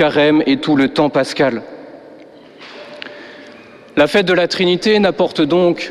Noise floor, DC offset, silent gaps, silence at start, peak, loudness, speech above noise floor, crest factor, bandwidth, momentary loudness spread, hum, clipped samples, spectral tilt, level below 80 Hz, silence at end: -40 dBFS; under 0.1%; none; 0 s; -2 dBFS; -14 LUFS; 26 dB; 14 dB; 12.5 kHz; 22 LU; none; under 0.1%; -5.5 dB/octave; -52 dBFS; 0 s